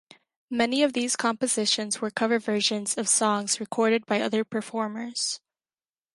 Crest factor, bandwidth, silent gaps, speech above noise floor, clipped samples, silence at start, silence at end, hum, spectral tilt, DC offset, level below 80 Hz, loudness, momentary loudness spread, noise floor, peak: 20 dB; 11.5 kHz; none; over 64 dB; under 0.1%; 0.5 s; 0.8 s; none; -2 dB/octave; under 0.1%; -74 dBFS; -25 LUFS; 8 LU; under -90 dBFS; -8 dBFS